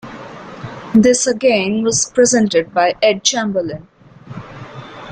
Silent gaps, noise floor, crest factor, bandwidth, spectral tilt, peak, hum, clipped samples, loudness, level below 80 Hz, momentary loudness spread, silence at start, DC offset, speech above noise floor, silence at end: none; -34 dBFS; 16 dB; 9.6 kHz; -3.5 dB/octave; 0 dBFS; none; under 0.1%; -14 LUFS; -52 dBFS; 21 LU; 0.05 s; under 0.1%; 20 dB; 0 s